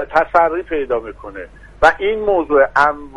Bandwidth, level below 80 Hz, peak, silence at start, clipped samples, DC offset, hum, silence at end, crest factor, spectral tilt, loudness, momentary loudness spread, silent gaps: 11.5 kHz; -40 dBFS; 0 dBFS; 0 s; under 0.1%; under 0.1%; none; 0.1 s; 16 dB; -5 dB/octave; -15 LUFS; 18 LU; none